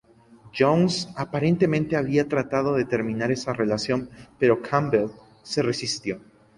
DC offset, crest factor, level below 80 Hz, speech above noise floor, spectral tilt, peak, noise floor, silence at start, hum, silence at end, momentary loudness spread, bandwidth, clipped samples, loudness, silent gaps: under 0.1%; 18 dB; -56 dBFS; 28 dB; -6 dB/octave; -6 dBFS; -52 dBFS; 0.45 s; none; 0.4 s; 9 LU; 11.5 kHz; under 0.1%; -24 LUFS; none